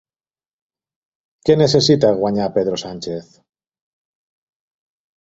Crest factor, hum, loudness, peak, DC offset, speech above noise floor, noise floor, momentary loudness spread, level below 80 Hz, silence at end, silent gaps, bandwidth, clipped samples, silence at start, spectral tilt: 18 dB; none; -16 LUFS; -2 dBFS; under 0.1%; over 74 dB; under -90 dBFS; 15 LU; -54 dBFS; 2 s; none; 8 kHz; under 0.1%; 1.45 s; -5.5 dB/octave